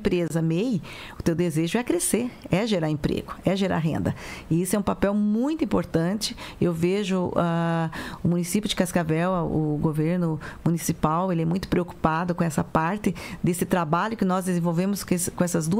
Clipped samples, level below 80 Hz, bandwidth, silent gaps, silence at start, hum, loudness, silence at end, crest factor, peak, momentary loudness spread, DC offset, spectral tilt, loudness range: under 0.1%; -46 dBFS; 16 kHz; none; 0 s; none; -25 LUFS; 0 s; 18 dB; -6 dBFS; 4 LU; under 0.1%; -6 dB/octave; 1 LU